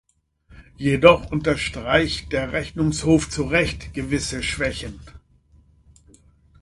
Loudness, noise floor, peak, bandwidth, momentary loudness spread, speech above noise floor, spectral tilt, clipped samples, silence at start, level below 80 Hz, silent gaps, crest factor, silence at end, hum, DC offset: -21 LUFS; -56 dBFS; 0 dBFS; 11.5 kHz; 11 LU; 35 dB; -5 dB/octave; under 0.1%; 0.5 s; -40 dBFS; none; 22 dB; 1.45 s; none; under 0.1%